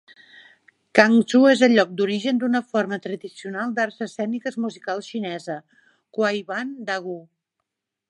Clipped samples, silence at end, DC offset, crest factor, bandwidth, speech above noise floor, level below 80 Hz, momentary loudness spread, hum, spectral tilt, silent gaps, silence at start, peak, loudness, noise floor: under 0.1%; 0.9 s; under 0.1%; 22 dB; 11 kHz; 59 dB; -74 dBFS; 17 LU; none; -5 dB/octave; none; 0.95 s; 0 dBFS; -22 LUFS; -81 dBFS